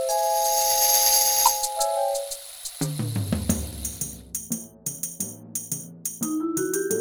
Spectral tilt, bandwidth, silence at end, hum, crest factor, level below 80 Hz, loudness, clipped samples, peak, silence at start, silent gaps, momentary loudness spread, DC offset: -2.5 dB/octave; over 20 kHz; 0 s; none; 22 dB; -46 dBFS; -23 LUFS; under 0.1%; -4 dBFS; 0 s; none; 15 LU; under 0.1%